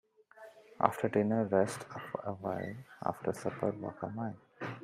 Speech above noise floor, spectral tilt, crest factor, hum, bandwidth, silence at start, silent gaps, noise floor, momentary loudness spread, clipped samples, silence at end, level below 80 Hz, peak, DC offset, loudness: 22 dB; -7 dB/octave; 28 dB; none; 15.5 kHz; 0.35 s; none; -56 dBFS; 14 LU; under 0.1%; 0 s; -74 dBFS; -8 dBFS; under 0.1%; -35 LUFS